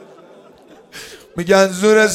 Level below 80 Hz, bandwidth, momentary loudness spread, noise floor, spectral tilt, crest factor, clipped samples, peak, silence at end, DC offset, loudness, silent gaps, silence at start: -54 dBFS; 16 kHz; 22 LU; -45 dBFS; -4 dB/octave; 16 dB; under 0.1%; 0 dBFS; 0 s; under 0.1%; -14 LUFS; none; 0.95 s